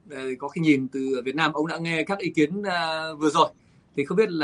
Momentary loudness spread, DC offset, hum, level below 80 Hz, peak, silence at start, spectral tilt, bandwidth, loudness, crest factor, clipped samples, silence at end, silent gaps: 9 LU; under 0.1%; none; -68 dBFS; -4 dBFS; 0.1 s; -5.5 dB/octave; 11.5 kHz; -25 LUFS; 20 dB; under 0.1%; 0 s; none